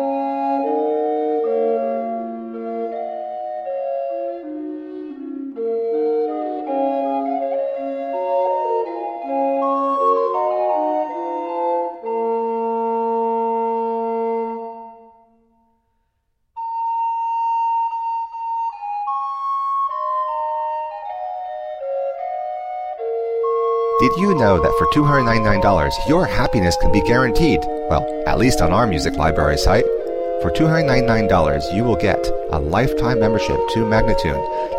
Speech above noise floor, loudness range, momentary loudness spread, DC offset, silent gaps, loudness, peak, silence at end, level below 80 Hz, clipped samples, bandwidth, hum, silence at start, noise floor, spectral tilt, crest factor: 52 dB; 9 LU; 12 LU; under 0.1%; none; -20 LUFS; -2 dBFS; 0 s; -32 dBFS; under 0.1%; 16 kHz; none; 0 s; -68 dBFS; -6.5 dB/octave; 16 dB